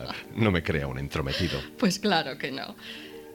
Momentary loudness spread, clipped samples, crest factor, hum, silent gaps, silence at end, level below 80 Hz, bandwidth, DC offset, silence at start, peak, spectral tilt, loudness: 13 LU; under 0.1%; 20 dB; none; none; 0 s; -46 dBFS; 19 kHz; under 0.1%; 0 s; -10 dBFS; -5 dB/octave; -28 LUFS